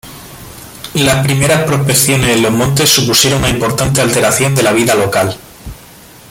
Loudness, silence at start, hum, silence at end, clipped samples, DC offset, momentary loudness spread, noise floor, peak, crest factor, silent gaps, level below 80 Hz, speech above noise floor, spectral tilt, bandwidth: -11 LUFS; 0.05 s; none; 0.55 s; under 0.1%; under 0.1%; 22 LU; -37 dBFS; 0 dBFS; 12 dB; none; -34 dBFS; 26 dB; -3.5 dB/octave; 17 kHz